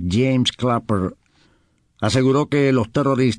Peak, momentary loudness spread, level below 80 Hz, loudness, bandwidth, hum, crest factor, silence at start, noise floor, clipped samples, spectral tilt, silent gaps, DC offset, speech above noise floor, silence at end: -6 dBFS; 6 LU; -48 dBFS; -19 LUFS; 10.5 kHz; none; 14 dB; 0 s; -61 dBFS; under 0.1%; -6 dB/octave; none; under 0.1%; 43 dB; 0 s